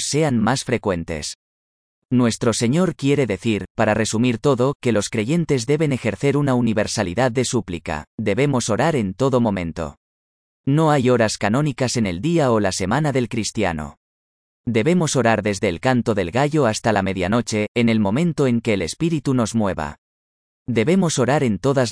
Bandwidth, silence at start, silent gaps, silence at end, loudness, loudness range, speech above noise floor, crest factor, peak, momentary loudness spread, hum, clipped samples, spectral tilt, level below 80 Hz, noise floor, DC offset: 10.5 kHz; 0 s; 1.35-2.02 s, 3.70-3.75 s, 4.75-4.80 s, 8.07-8.18 s, 9.97-10.64 s, 13.97-14.64 s, 17.68-17.75 s, 19.98-20.66 s; 0 s; -20 LUFS; 2 LU; over 71 dB; 16 dB; -4 dBFS; 7 LU; none; under 0.1%; -5.5 dB/octave; -48 dBFS; under -90 dBFS; under 0.1%